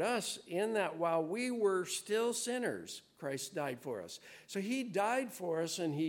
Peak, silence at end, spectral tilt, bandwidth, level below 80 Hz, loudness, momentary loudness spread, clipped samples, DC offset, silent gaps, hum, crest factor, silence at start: -20 dBFS; 0 s; -4 dB/octave; 17 kHz; -84 dBFS; -37 LUFS; 10 LU; under 0.1%; under 0.1%; none; none; 16 dB; 0 s